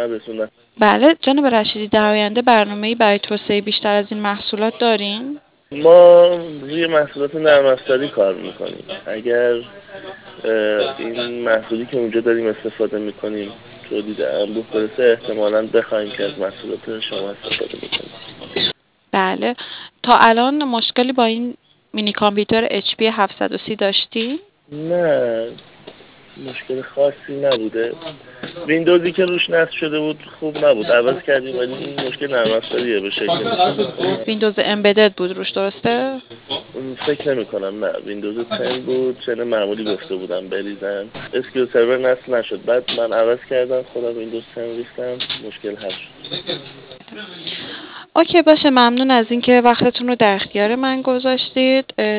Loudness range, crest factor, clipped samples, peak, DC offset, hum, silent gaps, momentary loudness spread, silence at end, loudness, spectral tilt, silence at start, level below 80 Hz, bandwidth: 8 LU; 18 dB; under 0.1%; 0 dBFS; under 0.1%; none; none; 15 LU; 0 s; -17 LUFS; -9 dB/octave; 0 s; -60 dBFS; 4 kHz